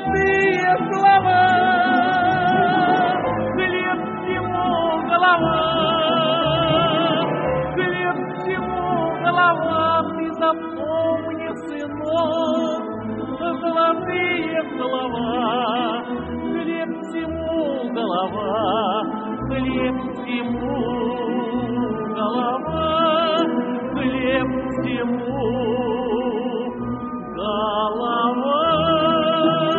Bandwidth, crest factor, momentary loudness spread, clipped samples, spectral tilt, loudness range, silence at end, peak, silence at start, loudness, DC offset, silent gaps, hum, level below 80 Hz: 4.5 kHz; 16 dB; 9 LU; under 0.1%; -3 dB/octave; 5 LU; 0 s; -4 dBFS; 0 s; -20 LUFS; under 0.1%; none; none; -46 dBFS